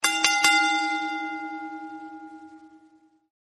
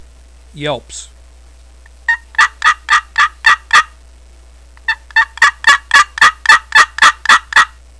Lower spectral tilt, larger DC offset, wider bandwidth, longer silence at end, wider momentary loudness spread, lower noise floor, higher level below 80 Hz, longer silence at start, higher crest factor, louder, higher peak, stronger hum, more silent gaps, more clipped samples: about the same, 1 dB/octave vs 0 dB/octave; second, under 0.1% vs 0.3%; first, 13 kHz vs 11 kHz; first, 0.65 s vs 0.35 s; first, 23 LU vs 14 LU; first, -59 dBFS vs -40 dBFS; second, -76 dBFS vs -40 dBFS; second, 0 s vs 0.55 s; first, 26 dB vs 14 dB; second, -22 LUFS vs -10 LUFS; about the same, -2 dBFS vs 0 dBFS; neither; neither; second, under 0.1% vs 0.7%